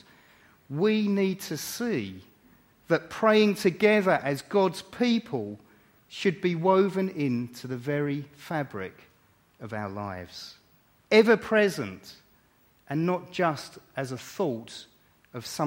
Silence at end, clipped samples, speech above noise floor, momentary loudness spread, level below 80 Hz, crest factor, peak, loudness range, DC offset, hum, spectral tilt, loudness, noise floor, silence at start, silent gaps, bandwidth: 0 s; under 0.1%; 37 dB; 18 LU; -68 dBFS; 22 dB; -6 dBFS; 7 LU; under 0.1%; none; -5.5 dB/octave; -27 LUFS; -63 dBFS; 0.7 s; none; 16.5 kHz